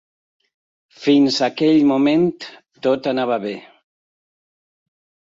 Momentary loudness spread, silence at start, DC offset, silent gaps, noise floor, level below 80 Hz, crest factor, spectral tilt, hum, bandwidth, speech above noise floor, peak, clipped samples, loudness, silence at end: 16 LU; 1 s; under 0.1%; none; under -90 dBFS; -64 dBFS; 16 dB; -5.5 dB/octave; none; 7.8 kHz; over 73 dB; -4 dBFS; under 0.1%; -17 LUFS; 1.7 s